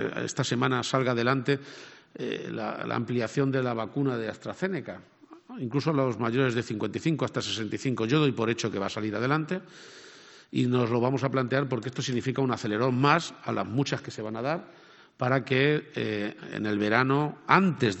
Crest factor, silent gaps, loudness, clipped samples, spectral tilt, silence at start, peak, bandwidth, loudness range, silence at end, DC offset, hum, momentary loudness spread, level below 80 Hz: 24 dB; none; -28 LUFS; under 0.1%; -6 dB/octave; 0 s; -4 dBFS; 8.4 kHz; 4 LU; 0 s; under 0.1%; none; 11 LU; -68 dBFS